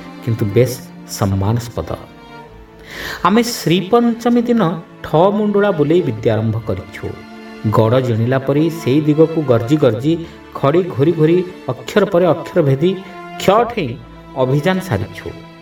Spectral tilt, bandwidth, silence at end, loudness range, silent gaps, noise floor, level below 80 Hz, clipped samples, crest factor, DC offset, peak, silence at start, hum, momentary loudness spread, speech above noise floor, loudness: -7 dB/octave; 19 kHz; 0 s; 3 LU; none; -38 dBFS; -46 dBFS; under 0.1%; 16 dB; under 0.1%; 0 dBFS; 0 s; none; 15 LU; 23 dB; -16 LUFS